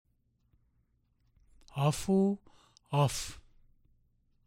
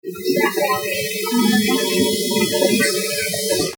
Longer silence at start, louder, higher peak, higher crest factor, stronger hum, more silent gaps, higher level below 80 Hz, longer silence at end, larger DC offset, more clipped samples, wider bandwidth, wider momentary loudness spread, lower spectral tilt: first, 1.75 s vs 0.05 s; second, -31 LUFS vs -18 LUFS; second, -16 dBFS vs -4 dBFS; about the same, 18 dB vs 16 dB; neither; neither; about the same, -58 dBFS vs -56 dBFS; first, 1.05 s vs 0 s; neither; neither; second, 16 kHz vs over 20 kHz; first, 14 LU vs 4 LU; first, -6 dB/octave vs -3 dB/octave